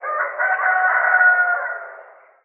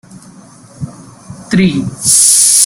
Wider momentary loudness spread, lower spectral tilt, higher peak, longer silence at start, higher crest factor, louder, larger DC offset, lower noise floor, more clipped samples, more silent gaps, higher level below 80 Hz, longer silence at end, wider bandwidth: second, 15 LU vs 23 LU; second, 5.5 dB/octave vs -2.5 dB/octave; second, -4 dBFS vs 0 dBFS; second, 0 s vs 0.15 s; about the same, 14 dB vs 12 dB; second, -16 LUFS vs -8 LUFS; neither; first, -44 dBFS vs -37 dBFS; second, under 0.1% vs 0.5%; neither; second, under -90 dBFS vs -46 dBFS; first, 0.45 s vs 0 s; second, 3.2 kHz vs over 20 kHz